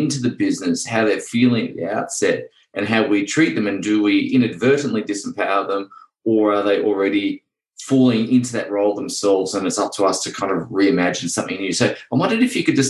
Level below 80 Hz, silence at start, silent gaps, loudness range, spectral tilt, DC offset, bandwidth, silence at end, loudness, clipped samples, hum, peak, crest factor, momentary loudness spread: -60 dBFS; 0 s; none; 1 LU; -4.5 dB/octave; under 0.1%; 12.5 kHz; 0 s; -19 LUFS; under 0.1%; none; -2 dBFS; 18 dB; 7 LU